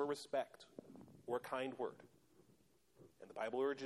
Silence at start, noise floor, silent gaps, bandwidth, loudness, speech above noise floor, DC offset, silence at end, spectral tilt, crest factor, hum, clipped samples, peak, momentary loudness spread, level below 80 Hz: 0 s; -74 dBFS; none; 14 kHz; -44 LUFS; 30 dB; under 0.1%; 0 s; -4.5 dB/octave; 18 dB; none; under 0.1%; -28 dBFS; 19 LU; -86 dBFS